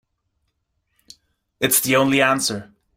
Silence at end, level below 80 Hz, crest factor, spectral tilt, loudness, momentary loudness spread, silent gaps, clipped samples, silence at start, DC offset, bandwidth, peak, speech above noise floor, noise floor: 0.35 s; -60 dBFS; 22 dB; -3 dB/octave; -18 LUFS; 9 LU; none; under 0.1%; 1.6 s; under 0.1%; 16.5 kHz; -2 dBFS; 54 dB; -72 dBFS